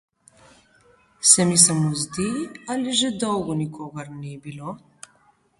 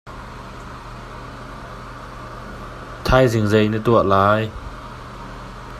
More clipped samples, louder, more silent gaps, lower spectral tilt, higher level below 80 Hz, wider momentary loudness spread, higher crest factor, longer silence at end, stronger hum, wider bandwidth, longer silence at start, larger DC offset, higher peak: neither; about the same, -19 LUFS vs -17 LUFS; neither; second, -3 dB/octave vs -6.5 dB/octave; second, -58 dBFS vs -36 dBFS; about the same, 21 LU vs 20 LU; about the same, 24 dB vs 20 dB; first, 0.8 s vs 0 s; neither; second, 12 kHz vs 15 kHz; first, 1.2 s vs 0.05 s; neither; about the same, 0 dBFS vs 0 dBFS